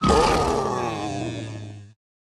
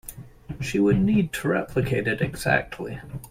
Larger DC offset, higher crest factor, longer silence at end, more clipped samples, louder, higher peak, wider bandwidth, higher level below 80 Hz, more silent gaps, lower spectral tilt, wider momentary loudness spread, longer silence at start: neither; about the same, 20 dB vs 20 dB; first, 0.45 s vs 0 s; neither; about the same, -23 LUFS vs -24 LUFS; about the same, -4 dBFS vs -6 dBFS; second, 13 kHz vs 16.5 kHz; first, -36 dBFS vs -46 dBFS; neither; second, -5 dB/octave vs -6.5 dB/octave; first, 20 LU vs 15 LU; about the same, 0 s vs 0.05 s